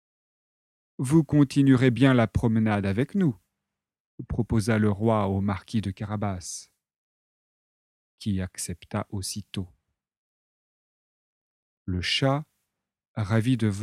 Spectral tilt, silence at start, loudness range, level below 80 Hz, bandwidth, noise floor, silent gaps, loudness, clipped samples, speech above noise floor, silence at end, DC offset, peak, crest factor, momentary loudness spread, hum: -6 dB/octave; 1 s; 12 LU; -50 dBFS; 13.5 kHz; -86 dBFS; 4.00-4.18 s, 6.96-8.18 s, 10.17-11.86 s, 13.08-13.15 s; -25 LUFS; under 0.1%; 62 dB; 0 s; under 0.1%; -6 dBFS; 22 dB; 16 LU; none